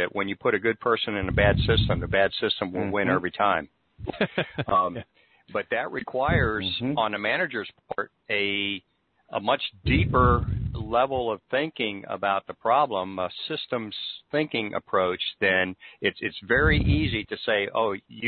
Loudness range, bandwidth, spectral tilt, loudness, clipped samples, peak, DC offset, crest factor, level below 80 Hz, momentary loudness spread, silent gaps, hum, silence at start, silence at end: 3 LU; 4.7 kHz; -10 dB/octave; -25 LUFS; under 0.1%; -6 dBFS; under 0.1%; 20 dB; -40 dBFS; 9 LU; none; none; 0 s; 0 s